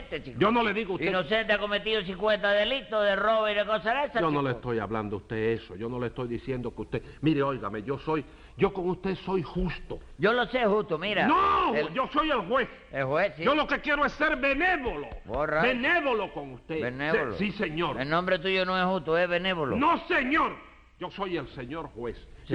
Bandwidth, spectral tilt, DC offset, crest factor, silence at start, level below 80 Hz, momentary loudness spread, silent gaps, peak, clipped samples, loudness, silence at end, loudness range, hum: 10 kHz; -7 dB/octave; under 0.1%; 16 dB; 0 s; -48 dBFS; 11 LU; none; -12 dBFS; under 0.1%; -27 LUFS; 0 s; 5 LU; none